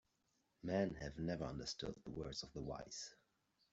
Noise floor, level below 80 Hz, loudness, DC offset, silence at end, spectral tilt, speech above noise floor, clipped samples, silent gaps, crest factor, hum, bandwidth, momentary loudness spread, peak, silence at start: -83 dBFS; -64 dBFS; -46 LUFS; under 0.1%; 0.6 s; -5 dB/octave; 38 dB; under 0.1%; none; 22 dB; none; 8 kHz; 10 LU; -26 dBFS; 0.65 s